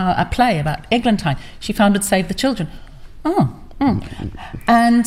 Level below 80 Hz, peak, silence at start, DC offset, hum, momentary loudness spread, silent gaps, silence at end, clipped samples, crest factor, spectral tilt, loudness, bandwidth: -36 dBFS; -4 dBFS; 0 s; under 0.1%; none; 11 LU; none; 0 s; under 0.1%; 14 dB; -5.5 dB/octave; -18 LUFS; 16 kHz